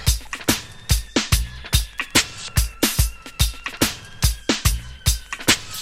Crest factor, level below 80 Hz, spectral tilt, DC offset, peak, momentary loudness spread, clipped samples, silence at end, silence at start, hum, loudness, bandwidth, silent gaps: 20 dB; -26 dBFS; -3 dB/octave; under 0.1%; -2 dBFS; 5 LU; under 0.1%; 0 s; 0 s; none; -22 LUFS; 16.5 kHz; none